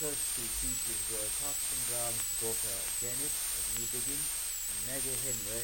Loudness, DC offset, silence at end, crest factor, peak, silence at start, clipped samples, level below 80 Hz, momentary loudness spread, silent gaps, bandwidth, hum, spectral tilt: -32 LUFS; under 0.1%; 0 s; 14 dB; -20 dBFS; 0 s; under 0.1%; -52 dBFS; 2 LU; none; 17 kHz; none; -0.5 dB/octave